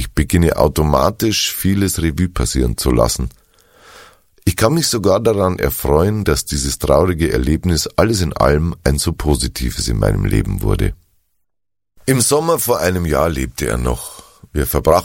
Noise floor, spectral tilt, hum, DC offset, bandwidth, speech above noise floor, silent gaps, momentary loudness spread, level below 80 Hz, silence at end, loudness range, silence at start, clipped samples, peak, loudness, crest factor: -79 dBFS; -5 dB/octave; none; under 0.1%; 17 kHz; 64 dB; none; 6 LU; -26 dBFS; 0 s; 3 LU; 0 s; under 0.1%; 0 dBFS; -16 LUFS; 16 dB